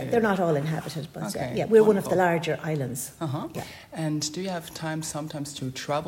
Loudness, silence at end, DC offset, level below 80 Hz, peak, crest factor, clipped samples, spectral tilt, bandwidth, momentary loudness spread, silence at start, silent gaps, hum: -26 LUFS; 0 s; under 0.1%; -60 dBFS; -6 dBFS; 20 dB; under 0.1%; -5.5 dB/octave; 16.5 kHz; 13 LU; 0 s; none; none